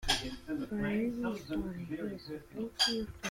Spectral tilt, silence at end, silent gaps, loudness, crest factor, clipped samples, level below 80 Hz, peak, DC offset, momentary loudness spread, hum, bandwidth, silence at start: -3.5 dB/octave; 0 s; none; -36 LUFS; 20 dB; under 0.1%; -50 dBFS; -16 dBFS; under 0.1%; 11 LU; none; 16.5 kHz; 0 s